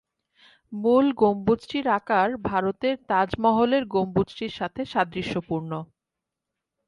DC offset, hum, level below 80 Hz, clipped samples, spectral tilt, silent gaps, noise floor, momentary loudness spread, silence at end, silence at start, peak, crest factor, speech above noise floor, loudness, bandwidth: under 0.1%; none; -56 dBFS; under 0.1%; -7.5 dB/octave; none; -86 dBFS; 10 LU; 1.05 s; 0.7 s; -8 dBFS; 18 dB; 62 dB; -24 LUFS; 11 kHz